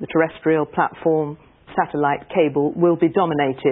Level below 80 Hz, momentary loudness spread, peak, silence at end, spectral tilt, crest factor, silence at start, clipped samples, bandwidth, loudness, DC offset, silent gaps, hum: -56 dBFS; 5 LU; -4 dBFS; 0 s; -12 dB/octave; 16 dB; 0 s; under 0.1%; 3.9 kHz; -20 LUFS; under 0.1%; none; none